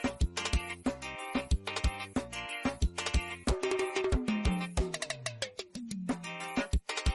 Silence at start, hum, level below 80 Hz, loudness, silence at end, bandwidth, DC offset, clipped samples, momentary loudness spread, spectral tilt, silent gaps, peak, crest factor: 0 s; none; -38 dBFS; -35 LUFS; 0 s; 11.5 kHz; under 0.1%; under 0.1%; 6 LU; -4.5 dB/octave; none; -20 dBFS; 14 dB